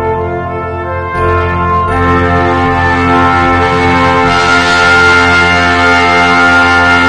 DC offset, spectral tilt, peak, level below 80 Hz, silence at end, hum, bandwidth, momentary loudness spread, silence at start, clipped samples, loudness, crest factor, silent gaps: under 0.1%; -5 dB/octave; 0 dBFS; -28 dBFS; 0 s; none; 10 kHz; 10 LU; 0 s; 0.6%; -8 LUFS; 8 dB; none